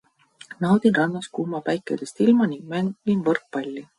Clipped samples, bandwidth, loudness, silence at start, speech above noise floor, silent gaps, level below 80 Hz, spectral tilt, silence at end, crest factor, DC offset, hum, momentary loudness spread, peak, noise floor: under 0.1%; 11.5 kHz; -23 LUFS; 0.5 s; 24 dB; none; -66 dBFS; -7 dB/octave; 0.15 s; 16 dB; under 0.1%; none; 11 LU; -6 dBFS; -46 dBFS